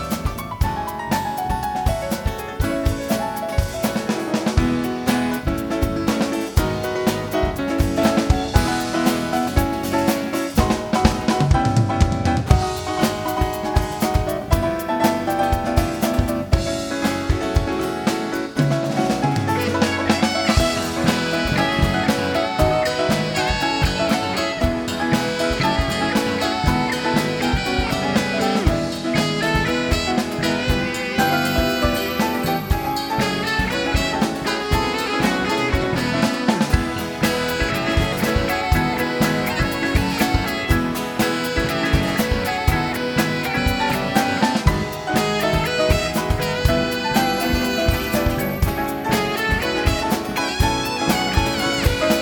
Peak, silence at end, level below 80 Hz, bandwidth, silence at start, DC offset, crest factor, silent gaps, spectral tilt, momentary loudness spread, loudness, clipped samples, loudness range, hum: 0 dBFS; 0 s; -28 dBFS; 19 kHz; 0 s; under 0.1%; 20 dB; none; -5 dB/octave; 4 LU; -20 LUFS; under 0.1%; 2 LU; none